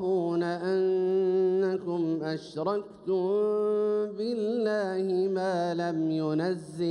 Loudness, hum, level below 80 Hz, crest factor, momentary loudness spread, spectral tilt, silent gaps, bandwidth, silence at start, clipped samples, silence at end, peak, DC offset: -28 LUFS; none; -74 dBFS; 12 dB; 6 LU; -7.5 dB/octave; none; 10.5 kHz; 0 s; under 0.1%; 0 s; -16 dBFS; under 0.1%